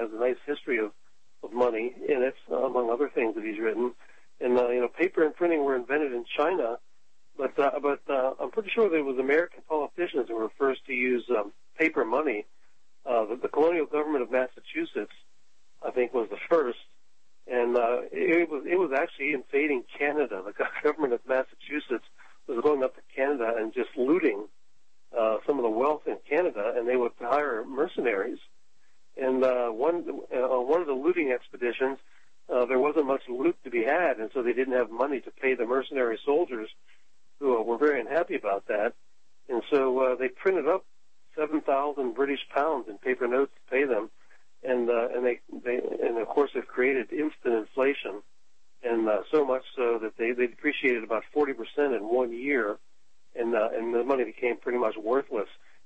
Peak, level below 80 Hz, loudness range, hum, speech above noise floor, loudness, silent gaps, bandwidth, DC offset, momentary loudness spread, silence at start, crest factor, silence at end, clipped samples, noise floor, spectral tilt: -12 dBFS; -72 dBFS; 2 LU; none; 46 dB; -28 LUFS; none; 8.2 kHz; 0.4%; 8 LU; 0 s; 16 dB; 0.4 s; under 0.1%; -74 dBFS; -6 dB/octave